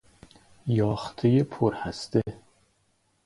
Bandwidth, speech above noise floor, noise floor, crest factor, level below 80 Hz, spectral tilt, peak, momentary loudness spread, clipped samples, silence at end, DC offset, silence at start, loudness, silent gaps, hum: 11.5 kHz; 44 dB; -69 dBFS; 20 dB; -54 dBFS; -7.5 dB/octave; -8 dBFS; 11 LU; under 0.1%; 0.9 s; under 0.1%; 0.65 s; -27 LUFS; none; none